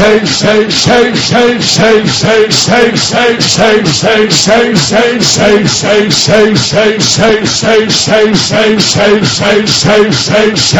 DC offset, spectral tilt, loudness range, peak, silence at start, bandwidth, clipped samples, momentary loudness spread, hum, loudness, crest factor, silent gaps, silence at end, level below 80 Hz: 0.6%; -3.5 dB/octave; 0 LU; 0 dBFS; 0 s; 18 kHz; 2%; 2 LU; none; -7 LUFS; 8 dB; none; 0 s; -36 dBFS